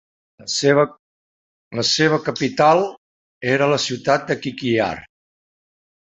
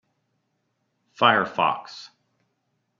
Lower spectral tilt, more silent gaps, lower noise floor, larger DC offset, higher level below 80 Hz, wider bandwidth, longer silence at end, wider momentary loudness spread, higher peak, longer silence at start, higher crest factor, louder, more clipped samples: about the same, -4 dB/octave vs -4.5 dB/octave; first, 0.99-1.71 s, 2.97-3.41 s vs none; first, under -90 dBFS vs -74 dBFS; neither; first, -58 dBFS vs -74 dBFS; first, 8.2 kHz vs 7.4 kHz; first, 1.1 s vs 0.95 s; second, 12 LU vs 22 LU; about the same, -2 dBFS vs -2 dBFS; second, 0.4 s vs 1.2 s; about the same, 20 dB vs 24 dB; first, -19 LUFS vs -22 LUFS; neither